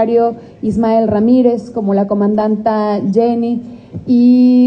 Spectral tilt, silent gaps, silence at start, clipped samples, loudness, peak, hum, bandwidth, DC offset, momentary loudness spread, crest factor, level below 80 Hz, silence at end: -9.5 dB/octave; none; 0 s; under 0.1%; -13 LUFS; 0 dBFS; none; 5.8 kHz; under 0.1%; 9 LU; 12 dB; -48 dBFS; 0 s